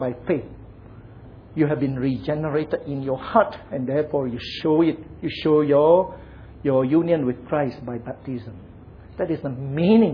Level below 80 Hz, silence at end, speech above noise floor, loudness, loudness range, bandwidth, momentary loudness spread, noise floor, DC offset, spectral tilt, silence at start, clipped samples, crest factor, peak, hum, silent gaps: -48 dBFS; 0 s; 22 dB; -22 LUFS; 5 LU; 5.4 kHz; 15 LU; -43 dBFS; under 0.1%; -9.5 dB/octave; 0 s; under 0.1%; 20 dB; -2 dBFS; none; none